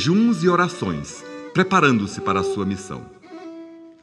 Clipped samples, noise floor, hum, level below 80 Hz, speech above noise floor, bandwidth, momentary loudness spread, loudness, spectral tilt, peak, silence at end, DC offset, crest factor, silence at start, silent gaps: under 0.1%; -40 dBFS; none; -54 dBFS; 20 dB; 11 kHz; 22 LU; -20 LUFS; -5.5 dB/octave; -2 dBFS; 0.1 s; under 0.1%; 20 dB; 0 s; none